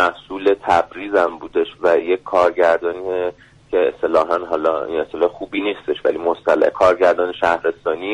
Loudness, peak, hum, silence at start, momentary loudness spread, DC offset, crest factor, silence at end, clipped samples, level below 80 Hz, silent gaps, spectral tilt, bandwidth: -18 LUFS; -4 dBFS; none; 0 s; 8 LU; under 0.1%; 14 dB; 0 s; under 0.1%; -54 dBFS; none; -5 dB/octave; 10.5 kHz